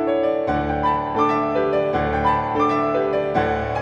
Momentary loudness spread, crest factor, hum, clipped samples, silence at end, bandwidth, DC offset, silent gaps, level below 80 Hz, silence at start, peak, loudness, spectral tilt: 2 LU; 14 dB; none; under 0.1%; 0 s; 8.6 kHz; under 0.1%; none; -38 dBFS; 0 s; -6 dBFS; -20 LUFS; -7.5 dB/octave